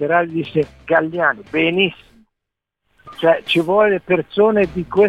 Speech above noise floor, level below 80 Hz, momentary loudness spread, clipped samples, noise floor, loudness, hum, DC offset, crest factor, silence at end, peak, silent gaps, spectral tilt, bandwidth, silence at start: 65 dB; -50 dBFS; 5 LU; under 0.1%; -81 dBFS; -17 LUFS; none; under 0.1%; 16 dB; 0 s; -2 dBFS; none; -6.5 dB/octave; 11.5 kHz; 0 s